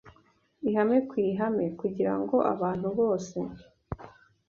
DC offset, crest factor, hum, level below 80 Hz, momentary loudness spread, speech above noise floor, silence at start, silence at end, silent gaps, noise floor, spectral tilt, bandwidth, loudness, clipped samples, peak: under 0.1%; 18 dB; none; -58 dBFS; 15 LU; 37 dB; 0.05 s; 0.4 s; none; -64 dBFS; -8 dB/octave; 7.6 kHz; -28 LUFS; under 0.1%; -12 dBFS